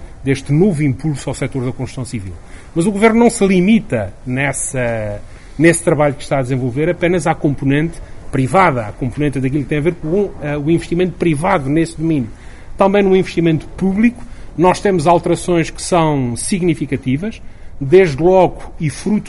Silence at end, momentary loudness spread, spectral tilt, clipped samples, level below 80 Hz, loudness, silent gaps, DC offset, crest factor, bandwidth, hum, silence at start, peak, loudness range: 0 s; 11 LU; -6 dB/octave; under 0.1%; -34 dBFS; -15 LUFS; none; under 0.1%; 16 dB; 11.5 kHz; none; 0 s; 0 dBFS; 2 LU